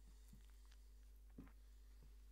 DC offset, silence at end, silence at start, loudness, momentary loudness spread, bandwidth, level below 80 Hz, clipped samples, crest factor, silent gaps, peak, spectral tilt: under 0.1%; 0 s; 0 s; -66 LUFS; 4 LU; 15.5 kHz; -62 dBFS; under 0.1%; 18 dB; none; -44 dBFS; -5.5 dB/octave